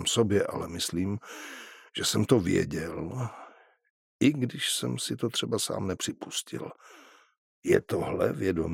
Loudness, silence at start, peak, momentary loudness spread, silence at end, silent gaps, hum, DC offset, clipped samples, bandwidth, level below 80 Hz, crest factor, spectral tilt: -29 LUFS; 0 s; -6 dBFS; 14 LU; 0 s; 3.90-4.19 s, 7.38-7.62 s; none; under 0.1%; under 0.1%; 16.5 kHz; -58 dBFS; 24 dB; -4.5 dB/octave